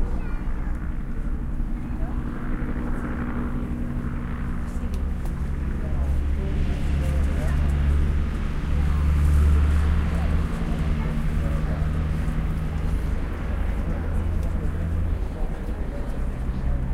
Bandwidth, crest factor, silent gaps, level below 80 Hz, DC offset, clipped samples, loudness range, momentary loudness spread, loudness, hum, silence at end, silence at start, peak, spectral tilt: 11 kHz; 14 dB; none; -24 dBFS; under 0.1%; under 0.1%; 7 LU; 8 LU; -27 LUFS; none; 0 s; 0 s; -10 dBFS; -8 dB/octave